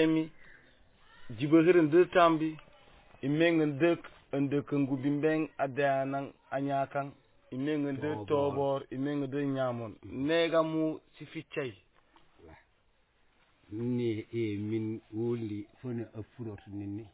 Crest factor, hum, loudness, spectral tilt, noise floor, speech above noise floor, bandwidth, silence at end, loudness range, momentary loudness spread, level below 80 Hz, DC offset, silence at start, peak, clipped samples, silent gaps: 20 dB; none; -31 LUFS; -6 dB/octave; -69 dBFS; 39 dB; 4 kHz; 0.05 s; 10 LU; 17 LU; -66 dBFS; under 0.1%; 0 s; -12 dBFS; under 0.1%; none